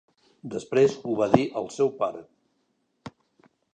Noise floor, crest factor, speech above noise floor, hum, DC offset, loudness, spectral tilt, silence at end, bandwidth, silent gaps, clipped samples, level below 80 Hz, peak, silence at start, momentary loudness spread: -73 dBFS; 26 dB; 48 dB; none; under 0.1%; -25 LUFS; -6.5 dB/octave; 0.65 s; 9.2 kHz; none; under 0.1%; -64 dBFS; 0 dBFS; 0.45 s; 24 LU